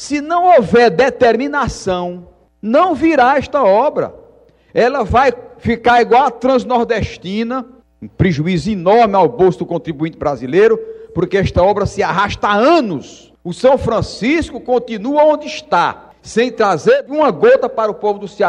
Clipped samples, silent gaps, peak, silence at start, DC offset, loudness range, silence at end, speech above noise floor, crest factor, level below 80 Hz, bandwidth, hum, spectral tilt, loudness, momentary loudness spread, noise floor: under 0.1%; none; 0 dBFS; 0 s; under 0.1%; 2 LU; 0 s; 33 dB; 12 dB; -38 dBFS; 10.5 kHz; none; -6 dB/octave; -14 LUFS; 11 LU; -47 dBFS